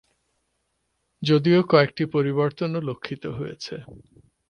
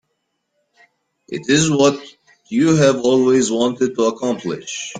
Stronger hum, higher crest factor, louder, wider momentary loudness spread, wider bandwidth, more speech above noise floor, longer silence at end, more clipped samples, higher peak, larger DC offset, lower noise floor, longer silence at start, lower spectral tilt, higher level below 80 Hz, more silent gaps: neither; about the same, 20 dB vs 16 dB; second, -23 LUFS vs -17 LUFS; first, 15 LU vs 12 LU; about the same, 9.6 kHz vs 9.6 kHz; second, 51 dB vs 56 dB; first, 0.5 s vs 0 s; neither; about the same, -4 dBFS vs -2 dBFS; neither; about the same, -74 dBFS vs -72 dBFS; about the same, 1.2 s vs 1.3 s; first, -7.5 dB/octave vs -4.5 dB/octave; about the same, -60 dBFS vs -56 dBFS; neither